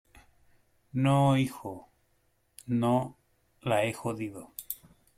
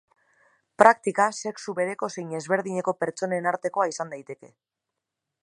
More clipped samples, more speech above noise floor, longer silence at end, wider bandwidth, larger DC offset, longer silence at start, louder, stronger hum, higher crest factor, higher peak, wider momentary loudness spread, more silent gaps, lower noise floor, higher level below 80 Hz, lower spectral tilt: neither; second, 43 dB vs 60 dB; second, 0.4 s vs 0.95 s; first, 16.5 kHz vs 11.5 kHz; neither; first, 0.95 s vs 0.8 s; second, -30 LUFS vs -25 LUFS; neither; second, 18 dB vs 26 dB; second, -14 dBFS vs 0 dBFS; about the same, 18 LU vs 16 LU; neither; second, -71 dBFS vs -85 dBFS; first, -64 dBFS vs -74 dBFS; first, -6.5 dB/octave vs -4.5 dB/octave